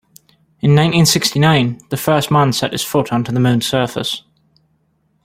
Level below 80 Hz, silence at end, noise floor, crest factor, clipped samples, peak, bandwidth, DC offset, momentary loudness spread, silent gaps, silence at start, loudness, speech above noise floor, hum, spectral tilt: -48 dBFS; 1.05 s; -62 dBFS; 16 dB; under 0.1%; 0 dBFS; 16.5 kHz; under 0.1%; 8 LU; none; 0.65 s; -15 LUFS; 47 dB; none; -5 dB/octave